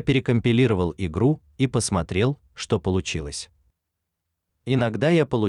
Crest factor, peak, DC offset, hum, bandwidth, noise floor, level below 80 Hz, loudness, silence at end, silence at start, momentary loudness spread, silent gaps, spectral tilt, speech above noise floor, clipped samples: 14 dB; -10 dBFS; under 0.1%; none; 11 kHz; -81 dBFS; -44 dBFS; -23 LUFS; 0 s; 0 s; 13 LU; none; -6 dB/octave; 59 dB; under 0.1%